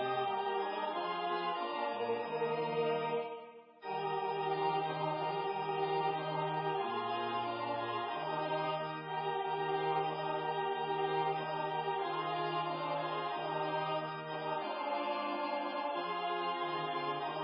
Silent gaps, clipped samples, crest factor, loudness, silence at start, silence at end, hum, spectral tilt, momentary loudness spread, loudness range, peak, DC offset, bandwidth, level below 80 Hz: none; under 0.1%; 14 dB; -36 LUFS; 0 s; 0 s; none; -3 dB/octave; 3 LU; 1 LU; -22 dBFS; under 0.1%; 5.4 kHz; -90 dBFS